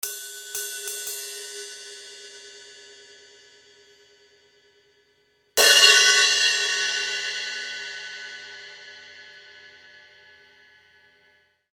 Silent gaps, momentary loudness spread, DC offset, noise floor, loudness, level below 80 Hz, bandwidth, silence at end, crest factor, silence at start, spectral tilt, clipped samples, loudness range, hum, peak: none; 29 LU; under 0.1%; -64 dBFS; -19 LUFS; -78 dBFS; 18 kHz; 2.05 s; 24 dB; 0.05 s; 3.5 dB/octave; under 0.1%; 21 LU; none; -2 dBFS